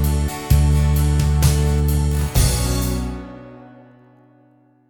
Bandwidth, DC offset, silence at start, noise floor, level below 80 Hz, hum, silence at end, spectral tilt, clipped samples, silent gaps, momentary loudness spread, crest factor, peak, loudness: 18 kHz; under 0.1%; 0 s; -54 dBFS; -22 dBFS; none; 1.2 s; -5.5 dB/octave; under 0.1%; none; 12 LU; 16 dB; -2 dBFS; -18 LUFS